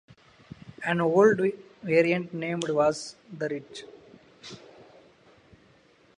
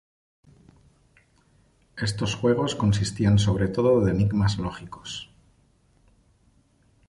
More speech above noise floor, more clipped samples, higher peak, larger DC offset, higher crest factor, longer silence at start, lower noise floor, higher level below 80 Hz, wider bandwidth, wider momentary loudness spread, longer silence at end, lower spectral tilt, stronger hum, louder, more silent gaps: second, 34 dB vs 39 dB; neither; about the same, -8 dBFS vs -8 dBFS; neither; about the same, 20 dB vs 18 dB; second, 0.8 s vs 1.95 s; about the same, -60 dBFS vs -62 dBFS; second, -68 dBFS vs -44 dBFS; about the same, 10.5 kHz vs 11.5 kHz; first, 25 LU vs 16 LU; second, 1.65 s vs 1.85 s; about the same, -6 dB/octave vs -6.5 dB/octave; neither; about the same, -26 LUFS vs -24 LUFS; neither